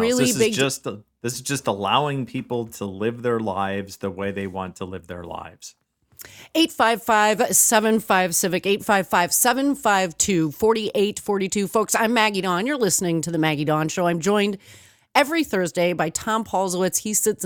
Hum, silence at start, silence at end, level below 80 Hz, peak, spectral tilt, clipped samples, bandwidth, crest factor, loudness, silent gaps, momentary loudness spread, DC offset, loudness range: none; 0 s; 0 s; -60 dBFS; -2 dBFS; -3.5 dB/octave; under 0.1%; 19.5 kHz; 20 dB; -21 LUFS; none; 12 LU; under 0.1%; 9 LU